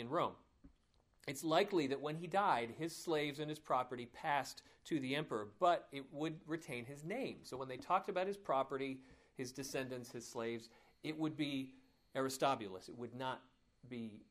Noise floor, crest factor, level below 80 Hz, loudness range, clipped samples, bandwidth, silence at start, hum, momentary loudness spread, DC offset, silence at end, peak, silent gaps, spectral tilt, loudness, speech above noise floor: -75 dBFS; 20 dB; -76 dBFS; 5 LU; under 0.1%; 15.5 kHz; 0 s; none; 14 LU; under 0.1%; 0.05 s; -22 dBFS; none; -4.5 dB/octave; -41 LUFS; 34 dB